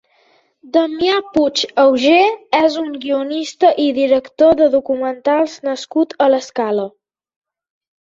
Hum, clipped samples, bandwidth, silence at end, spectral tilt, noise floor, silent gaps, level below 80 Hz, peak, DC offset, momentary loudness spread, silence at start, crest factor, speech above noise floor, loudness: none; under 0.1%; 7.8 kHz; 1.1 s; -3.5 dB/octave; -56 dBFS; none; -56 dBFS; -2 dBFS; under 0.1%; 8 LU; 0.65 s; 14 dB; 41 dB; -15 LUFS